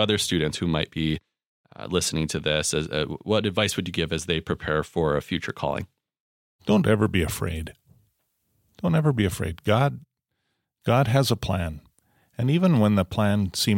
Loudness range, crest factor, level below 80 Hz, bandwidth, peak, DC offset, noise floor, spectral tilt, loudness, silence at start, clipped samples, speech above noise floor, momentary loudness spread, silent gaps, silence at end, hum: 3 LU; 18 dB; -46 dBFS; 17 kHz; -6 dBFS; under 0.1%; -78 dBFS; -5 dB/octave; -24 LUFS; 0 s; under 0.1%; 54 dB; 12 LU; 1.46-1.64 s, 6.20-6.59 s; 0 s; none